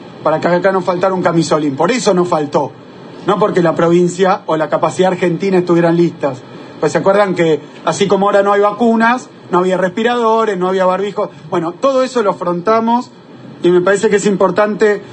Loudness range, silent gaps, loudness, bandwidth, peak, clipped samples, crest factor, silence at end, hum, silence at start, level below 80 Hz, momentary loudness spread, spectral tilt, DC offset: 2 LU; none; -13 LUFS; 9.4 kHz; 0 dBFS; under 0.1%; 12 dB; 0 s; none; 0 s; -58 dBFS; 8 LU; -6 dB/octave; under 0.1%